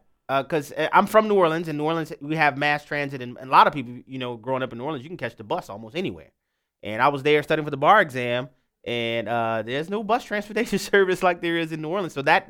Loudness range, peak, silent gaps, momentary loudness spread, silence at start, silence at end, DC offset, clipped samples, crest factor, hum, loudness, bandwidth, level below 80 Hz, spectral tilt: 5 LU; -2 dBFS; none; 15 LU; 0.3 s; 0.05 s; under 0.1%; under 0.1%; 22 dB; none; -23 LUFS; 18 kHz; -60 dBFS; -5.5 dB/octave